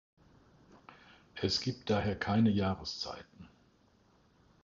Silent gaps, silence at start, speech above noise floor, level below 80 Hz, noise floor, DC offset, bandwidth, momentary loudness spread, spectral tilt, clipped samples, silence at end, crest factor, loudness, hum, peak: none; 0.75 s; 35 dB; -56 dBFS; -67 dBFS; under 0.1%; 7.6 kHz; 18 LU; -5.5 dB/octave; under 0.1%; 1.2 s; 20 dB; -33 LUFS; none; -18 dBFS